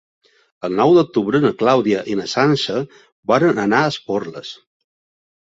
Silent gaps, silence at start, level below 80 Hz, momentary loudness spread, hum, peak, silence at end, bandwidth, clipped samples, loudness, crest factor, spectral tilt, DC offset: 3.12-3.23 s; 0.65 s; -58 dBFS; 16 LU; none; -2 dBFS; 0.9 s; 7.8 kHz; under 0.1%; -17 LUFS; 16 dB; -6 dB/octave; under 0.1%